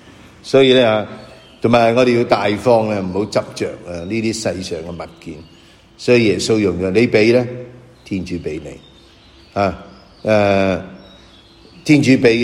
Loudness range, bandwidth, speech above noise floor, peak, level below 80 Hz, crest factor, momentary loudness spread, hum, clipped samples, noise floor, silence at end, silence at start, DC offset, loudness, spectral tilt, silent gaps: 6 LU; 13 kHz; 30 dB; 0 dBFS; -48 dBFS; 16 dB; 19 LU; none; under 0.1%; -45 dBFS; 0 s; 0.45 s; under 0.1%; -16 LUFS; -5.5 dB/octave; none